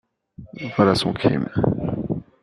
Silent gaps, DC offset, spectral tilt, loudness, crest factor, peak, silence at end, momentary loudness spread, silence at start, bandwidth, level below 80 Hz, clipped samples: none; under 0.1%; -7 dB/octave; -21 LUFS; 20 dB; -2 dBFS; 0.2 s; 12 LU; 0.4 s; 12 kHz; -46 dBFS; under 0.1%